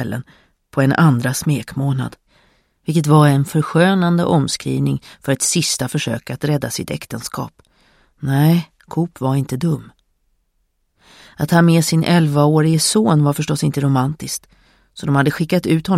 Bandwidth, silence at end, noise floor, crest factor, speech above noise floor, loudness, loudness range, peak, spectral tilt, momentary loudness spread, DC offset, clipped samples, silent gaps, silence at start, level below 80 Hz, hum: 15.5 kHz; 0 s; -66 dBFS; 16 dB; 50 dB; -17 LUFS; 6 LU; 0 dBFS; -5.5 dB/octave; 13 LU; under 0.1%; under 0.1%; none; 0 s; -50 dBFS; none